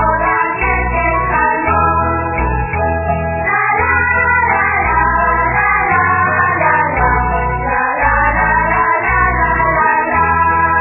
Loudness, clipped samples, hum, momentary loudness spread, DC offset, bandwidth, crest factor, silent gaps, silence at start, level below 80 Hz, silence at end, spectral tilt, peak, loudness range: -13 LUFS; under 0.1%; none; 5 LU; under 0.1%; 2.9 kHz; 12 dB; none; 0 s; -24 dBFS; 0 s; -11 dB/octave; 0 dBFS; 2 LU